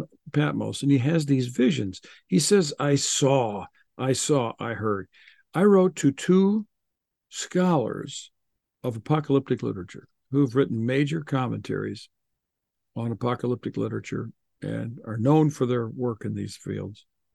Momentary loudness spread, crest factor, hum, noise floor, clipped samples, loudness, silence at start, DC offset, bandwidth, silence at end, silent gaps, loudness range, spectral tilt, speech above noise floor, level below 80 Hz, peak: 14 LU; 18 dB; none; -83 dBFS; under 0.1%; -25 LUFS; 0 s; under 0.1%; 12.5 kHz; 0.4 s; none; 6 LU; -5.5 dB/octave; 58 dB; -66 dBFS; -8 dBFS